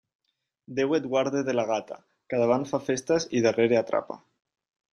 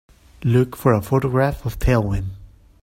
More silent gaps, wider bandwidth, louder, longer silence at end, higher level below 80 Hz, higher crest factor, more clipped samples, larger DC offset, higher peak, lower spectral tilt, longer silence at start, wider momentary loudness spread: neither; second, 11 kHz vs 16.5 kHz; second, -26 LUFS vs -20 LUFS; first, 0.75 s vs 0.35 s; second, -68 dBFS vs -32 dBFS; about the same, 18 dB vs 18 dB; neither; neither; second, -8 dBFS vs -2 dBFS; second, -5 dB/octave vs -8 dB/octave; first, 0.7 s vs 0.4 s; first, 14 LU vs 9 LU